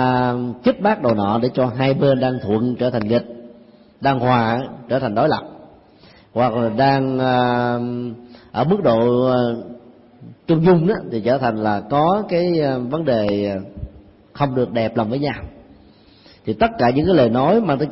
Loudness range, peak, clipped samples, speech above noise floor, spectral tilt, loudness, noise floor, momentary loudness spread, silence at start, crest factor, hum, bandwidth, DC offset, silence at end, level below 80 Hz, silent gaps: 3 LU; -4 dBFS; under 0.1%; 31 dB; -11.5 dB/octave; -18 LUFS; -48 dBFS; 13 LU; 0 s; 14 dB; none; 5.8 kHz; under 0.1%; 0 s; -46 dBFS; none